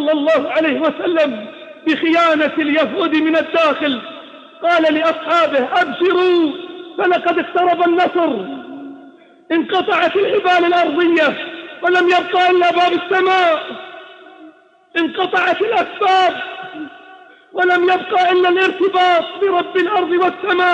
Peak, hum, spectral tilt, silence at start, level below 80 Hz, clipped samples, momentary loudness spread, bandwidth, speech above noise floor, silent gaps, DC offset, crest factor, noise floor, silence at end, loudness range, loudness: -4 dBFS; none; -4.5 dB/octave; 0 s; -68 dBFS; under 0.1%; 15 LU; 8 kHz; 30 dB; none; under 0.1%; 12 dB; -45 dBFS; 0 s; 3 LU; -15 LUFS